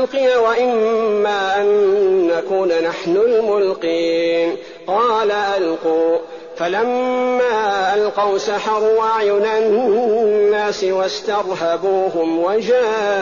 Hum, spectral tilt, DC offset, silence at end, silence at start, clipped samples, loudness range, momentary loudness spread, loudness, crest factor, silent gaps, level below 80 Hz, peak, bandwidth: none; -2.5 dB/octave; 0.2%; 0 s; 0 s; under 0.1%; 2 LU; 4 LU; -17 LUFS; 10 dB; none; -60 dBFS; -6 dBFS; 7.2 kHz